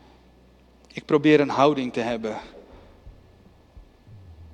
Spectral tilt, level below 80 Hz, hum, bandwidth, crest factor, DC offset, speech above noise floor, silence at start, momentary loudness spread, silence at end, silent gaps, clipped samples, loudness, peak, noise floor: -6.5 dB/octave; -54 dBFS; none; 8.8 kHz; 22 dB; under 0.1%; 33 dB; 0.95 s; 22 LU; 0.05 s; none; under 0.1%; -22 LUFS; -4 dBFS; -54 dBFS